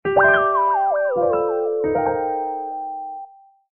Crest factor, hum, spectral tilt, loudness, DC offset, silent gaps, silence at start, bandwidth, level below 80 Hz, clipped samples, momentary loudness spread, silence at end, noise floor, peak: 16 dB; none; 1.5 dB/octave; -20 LUFS; 0.1%; none; 0.05 s; 3.5 kHz; -56 dBFS; under 0.1%; 15 LU; 0.55 s; -42 dBFS; -4 dBFS